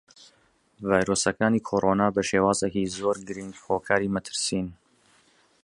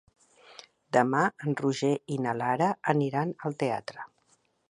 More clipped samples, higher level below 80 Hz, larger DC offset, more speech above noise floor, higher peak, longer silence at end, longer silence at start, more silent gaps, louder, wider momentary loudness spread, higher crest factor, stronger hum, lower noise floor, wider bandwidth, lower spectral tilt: neither; first, -54 dBFS vs -74 dBFS; neither; about the same, 39 dB vs 41 dB; first, -4 dBFS vs -8 dBFS; first, 0.9 s vs 0.65 s; first, 0.8 s vs 0.5 s; neither; first, -25 LUFS vs -28 LUFS; second, 9 LU vs 18 LU; about the same, 22 dB vs 22 dB; neither; second, -64 dBFS vs -69 dBFS; about the same, 11.5 kHz vs 11.5 kHz; second, -4.5 dB/octave vs -6.5 dB/octave